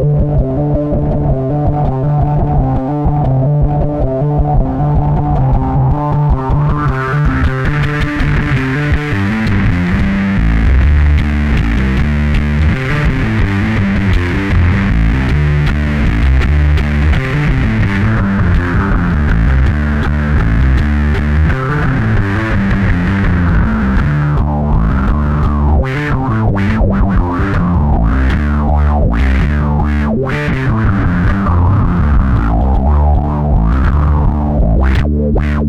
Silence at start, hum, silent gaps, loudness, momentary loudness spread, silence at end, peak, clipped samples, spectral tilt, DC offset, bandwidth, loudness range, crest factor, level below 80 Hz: 0 s; none; none; -13 LUFS; 2 LU; 0 s; 0 dBFS; under 0.1%; -8.5 dB/octave; under 0.1%; 7.2 kHz; 1 LU; 10 dB; -14 dBFS